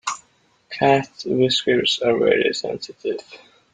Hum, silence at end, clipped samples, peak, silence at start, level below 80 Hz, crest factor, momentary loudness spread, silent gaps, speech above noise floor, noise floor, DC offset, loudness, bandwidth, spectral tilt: none; 0.35 s; under 0.1%; -4 dBFS; 0.05 s; -60 dBFS; 18 dB; 12 LU; none; 40 dB; -60 dBFS; under 0.1%; -20 LUFS; 9.6 kHz; -4 dB/octave